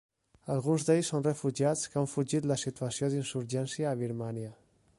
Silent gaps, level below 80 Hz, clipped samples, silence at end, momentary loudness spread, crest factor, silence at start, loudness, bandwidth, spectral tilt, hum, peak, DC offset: none; -68 dBFS; under 0.1%; 0.45 s; 9 LU; 18 dB; 0.45 s; -32 LUFS; 11.5 kHz; -5.5 dB/octave; none; -14 dBFS; under 0.1%